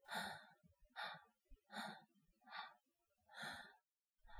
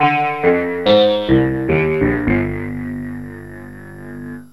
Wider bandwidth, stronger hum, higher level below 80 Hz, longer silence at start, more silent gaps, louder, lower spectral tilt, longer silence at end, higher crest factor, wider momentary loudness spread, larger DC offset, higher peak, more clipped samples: first, 16.5 kHz vs 12 kHz; neither; second, -76 dBFS vs -36 dBFS; about the same, 0.05 s vs 0 s; neither; second, -54 LUFS vs -16 LUFS; second, -2.5 dB/octave vs -8 dB/octave; about the same, 0 s vs 0.1 s; about the same, 22 dB vs 18 dB; second, 13 LU vs 20 LU; second, under 0.1% vs 0.5%; second, -34 dBFS vs 0 dBFS; neither